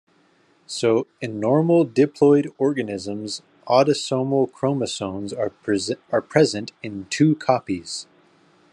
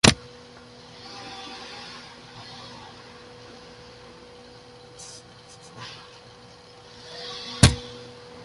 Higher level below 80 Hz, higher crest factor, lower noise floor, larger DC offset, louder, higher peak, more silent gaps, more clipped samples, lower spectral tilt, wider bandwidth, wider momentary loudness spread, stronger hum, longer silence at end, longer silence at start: second, -68 dBFS vs -40 dBFS; second, 18 dB vs 30 dB; first, -60 dBFS vs -48 dBFS; neither; first, -21 LUFS vs -27 LUFS; about the same, -2 dBFS vs 0 dBFS; neither; neither; first, -5.5 dB/octave vs -3.5 dB/octave; about the same, 11 kHz vs 11.5 kHz; second, 13 LU vs 27 LU; neither; first, 0.7 s vs 0 s; first, 0.7 s vs 0.05 s